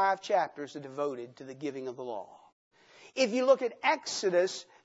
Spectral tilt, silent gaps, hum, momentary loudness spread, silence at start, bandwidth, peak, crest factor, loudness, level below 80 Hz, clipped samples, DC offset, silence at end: -3 dB/octave; 2.53-2.71 s; none; 16 LU; 0 s; 8 kHz; -10 dBFS; 20 dB; -31 LUFS; -88 dBFS; under 0.1%; under 0.1%; 0.2 s